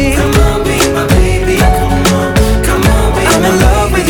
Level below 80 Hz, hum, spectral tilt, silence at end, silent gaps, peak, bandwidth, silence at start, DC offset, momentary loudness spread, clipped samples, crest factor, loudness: -14 dBFS; none; -5 dB/octave; 0 s; none; 0 dBFS; over 20 kHz; 0 s; under 0.1%; 2 LU; under 0.1%; 8 dB; -10 LUFS